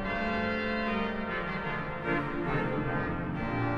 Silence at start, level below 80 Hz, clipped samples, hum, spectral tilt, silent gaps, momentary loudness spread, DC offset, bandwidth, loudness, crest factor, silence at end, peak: 0 s; -44 dBFS; under 0.1%; none; -8 dB/octave; none; 3 LU; under 0.1%; 7.4 kHz; -32 LUFS; 14 dB; 0 s; -18 dBFS